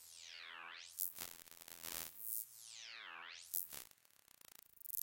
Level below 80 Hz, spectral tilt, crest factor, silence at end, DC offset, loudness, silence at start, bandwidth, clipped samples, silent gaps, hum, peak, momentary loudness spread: -82 dBFS; 1 dB/octave; 36 dB; 0 s; under 0.1%; -47 LUFS; 0 s; 17 kHz; under 0.1%; none; none; -16 dBFS; 17 LU